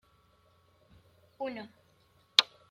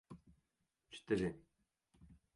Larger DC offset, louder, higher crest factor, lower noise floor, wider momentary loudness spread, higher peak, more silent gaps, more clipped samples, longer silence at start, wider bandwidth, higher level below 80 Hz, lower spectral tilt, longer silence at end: neither; first, -29 LUFS vs -40 LUFS; first, 36 dB vs 22 dB; second, -67 dBFS vs -86 dBFS; about the same, 21 LU vs 22 LU; first, 0 dBFS vs -24 dBFS; neither; neither; first, 1.4 s vs 0.1 s; first, 16.5 kHz vs 11.5 kHz; second, -76 dBFS vs -68 dBFS; second, -0.5 dB/octave vs -6.5 dB/octave; about the same, 0.25 s vs 0.2 s